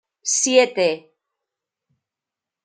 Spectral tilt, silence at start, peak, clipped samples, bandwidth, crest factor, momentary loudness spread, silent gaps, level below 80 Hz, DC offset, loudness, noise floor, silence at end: -1.5 dB/octave; 0.25 s; -2 dBFS; under 0.1%; 9.6 kHz; 20 dB; 8 LU; none; -78 dBFS; under 0.1%; -18 LUFS; -87 dBFS; 1.65 s